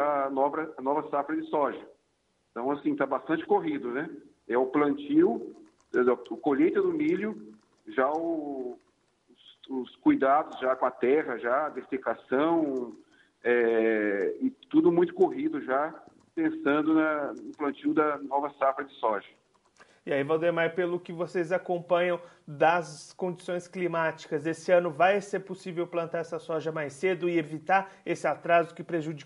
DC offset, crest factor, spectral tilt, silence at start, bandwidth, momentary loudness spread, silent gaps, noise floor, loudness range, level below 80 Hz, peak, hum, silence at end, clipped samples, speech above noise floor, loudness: under 0.1%; 20 dB; -6.5 dB/octave; 0 s; 11.5 kHz; 11 LU; none; -73 dBFS; 3 LU; -76 dBFS; -10 dBFS; none; 0 s; under 0.1%; 45 dB; -28 LUFS